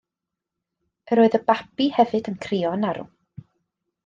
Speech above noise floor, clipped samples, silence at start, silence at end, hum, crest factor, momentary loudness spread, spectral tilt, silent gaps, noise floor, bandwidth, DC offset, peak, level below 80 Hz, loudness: 65 dB; under 0.1%; 1.05 s; 1 s; none; 20 dB; 9 LU; -7 dB/octave; none; -86 dBFS; 7.6 kHz; under 0.1%; -4 dBFS; -66 dBFS; -22 LUFS